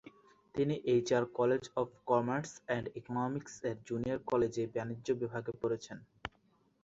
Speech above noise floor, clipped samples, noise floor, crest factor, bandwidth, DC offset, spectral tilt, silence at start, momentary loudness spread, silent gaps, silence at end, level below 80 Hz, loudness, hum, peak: 37 dB; under 0.1%; -71 dBFS; 20 dB; 8 kHz; under 0.1%; -6 dB/octave; 0.05 s; 10 LU; none; 0.55 s; -66 dBFS; -35 LUFS; none; -16 dBFS